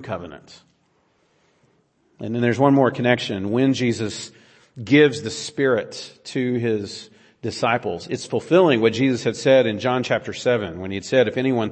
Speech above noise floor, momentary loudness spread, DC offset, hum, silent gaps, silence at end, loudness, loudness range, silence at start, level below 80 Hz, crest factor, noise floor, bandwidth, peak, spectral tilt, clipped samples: 43 dB; 16 LU; under 0.1%; none; none; 0 s; -20 LUFS; 3 LU; 0 s; -62 dBFS; 18 dB; -64 dBFS; 8.8 kHz; -2 dBFS; -5.5 dB/octave; under 0.1%